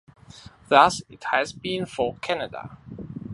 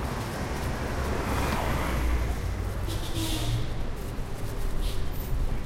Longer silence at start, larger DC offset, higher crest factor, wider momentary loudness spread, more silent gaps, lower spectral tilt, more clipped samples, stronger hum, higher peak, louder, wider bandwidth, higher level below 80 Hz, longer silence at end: first, 0.35 s vs 0 s; neither; first, 24 dB vs 14 dB; first, 21 LU vs 7 LU; neither; about the same, -4 dB/octave vs -5 dB/octave; neither; neither; first, -2 dBFS vs -14 dBFS; first, -23 LUFS vs -31 LUFS; second, 11.5 kHz vs 16 kHz; second, -56 dBFS vs -30 dBFS; about the same, 0 s vs 0 s